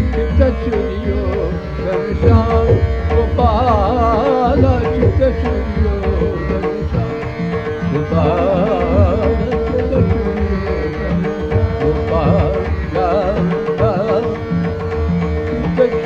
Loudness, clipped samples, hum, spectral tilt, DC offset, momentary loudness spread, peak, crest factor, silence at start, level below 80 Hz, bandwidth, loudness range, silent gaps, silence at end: -16 LUFS; under 0.1%; none; -9 dB/octave; 0.4%; 6 LU; 0 dBFS; 14 dB; 0 s; -22 dBFS; 7 kHz; 3 LU; none; 0 s